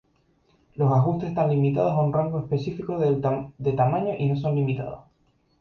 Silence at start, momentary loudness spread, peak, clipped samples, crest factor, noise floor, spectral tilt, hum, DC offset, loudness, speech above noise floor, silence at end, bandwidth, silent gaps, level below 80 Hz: 0.75 s; 7 LU; -10 dBFS; under 0.1%; 16 dB; -65 dBFS; -10 dB/octave; none; under 0.1%; -24 LUFS; 42 dB; 0.6 s; 6 kHz; none; -56 dBFS